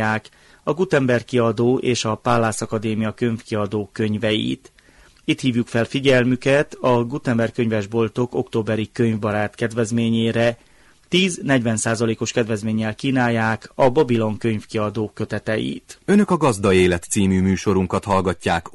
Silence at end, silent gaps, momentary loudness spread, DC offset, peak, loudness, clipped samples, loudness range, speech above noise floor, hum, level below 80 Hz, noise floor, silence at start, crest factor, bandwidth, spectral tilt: 0.05 s; none; 7 LU; under 0.1%; -6 dBFS; -20 LUFS; under 0.1%; 2 LU; 31 dB; none; -50 dBFS; -51 dBFS; 0 s; 14 dB; 11.5 kHz; -5.5 dB/octave